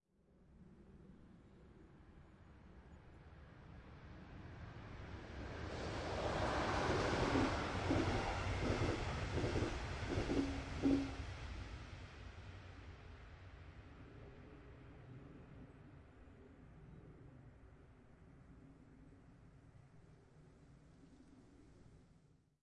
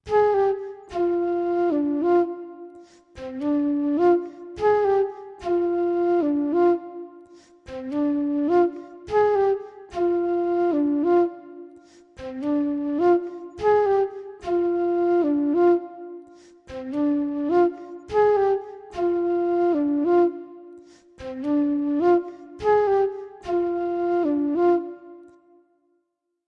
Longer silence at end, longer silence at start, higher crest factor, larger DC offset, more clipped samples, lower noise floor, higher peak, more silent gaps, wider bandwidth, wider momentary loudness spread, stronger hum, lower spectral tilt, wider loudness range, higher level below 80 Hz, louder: second, 0.5 s vs 1.25 s; first, 0.5 s vs 0.05 s; first, 22 dB vs 14 dB; neither; neither; second, -71 dBFS vs -76 dBFS; second, -24 dBFS vs -8 dBFS; neither; first, 11 kHz vs 6.2 kHz; first, 26 LU vs 17 LU; neither; second, -6 dB/octave vs -7.5 dB/octave; first, 25 LU vs 2 LU; about the same, -54 dBFS vs -58 dBFS; second, -42 LUFS vs -23 LUFS